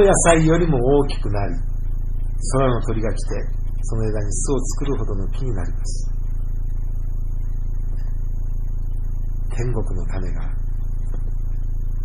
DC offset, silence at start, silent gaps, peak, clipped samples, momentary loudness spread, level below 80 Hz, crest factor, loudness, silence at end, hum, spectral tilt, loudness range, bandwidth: 2%; 0 s; none; -2 dBFS; under 0.1%; 12 LU; -22 dBFS; 18 dB; -24 LUFS; 0 s; none; -5.5 dB/octave; 8 LU; 10.5 kHz